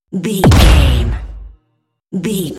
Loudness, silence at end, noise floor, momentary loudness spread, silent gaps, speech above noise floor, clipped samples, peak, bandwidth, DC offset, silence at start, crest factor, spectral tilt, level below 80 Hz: -12 LUFS; 0 s; -66 dBFS; 17 LU; none; 55 dB; 0.2%; 0 dBFS; 16 kHz; under 0.1%; 0.1 s; 12 dB; -5.5 dB/octave; -16 dBFS